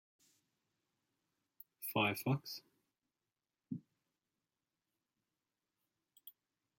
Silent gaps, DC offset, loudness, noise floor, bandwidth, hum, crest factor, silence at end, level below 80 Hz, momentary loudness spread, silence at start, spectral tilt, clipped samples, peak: none; under 0.1%; -40 LUFS; under -90 dBFS; 16.5 kHz; none; 26 dB; 0.5 s; -84 dBFS; 24 LU; 1.8 s; -5 dB/octave; under 0.1%; -20 dBFS